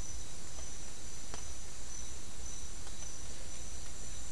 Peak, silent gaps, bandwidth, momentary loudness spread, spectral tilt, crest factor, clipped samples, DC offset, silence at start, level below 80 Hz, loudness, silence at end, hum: -26 dBFS; none; 12 kHz; 2 LU; -2.5 dB/octave; 22 dB; under 0.1%; 3%; 0 s; -50 dBFS; -45 LUFS; 0 s; none